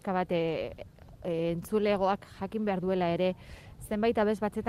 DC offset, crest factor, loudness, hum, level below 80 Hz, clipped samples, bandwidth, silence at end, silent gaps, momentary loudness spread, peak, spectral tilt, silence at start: under 0.1%; 14 dB; -30 LUFS; none; -54 dBFS; under 0.1%; 15.5 kHz; 0 s; none; 16 LU; -16 dBFS; -7 dB/octave; 0.05 s